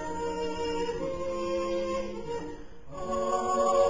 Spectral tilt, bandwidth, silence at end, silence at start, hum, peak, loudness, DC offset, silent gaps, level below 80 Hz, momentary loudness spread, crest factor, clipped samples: -4.5 dB/octave; 7.8 kHz; 0 s; 0 s; none; -14 dBFS; -32 LUFS; 0.7%; none; -50 dBFS; 12 LU; 16 dB; under 0.1%